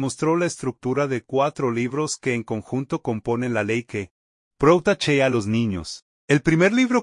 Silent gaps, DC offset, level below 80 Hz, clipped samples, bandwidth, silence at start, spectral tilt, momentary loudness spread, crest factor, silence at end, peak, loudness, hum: 4.11-4.51 s, 6.02-6.28 s; under 0.1%; -52 dBFS; under 0.1%; 11 kHz; 0 s; -5.5 dB/octave; 10 LU; 18 dB; 0 s; -4 dBFS; -22 LUFS; none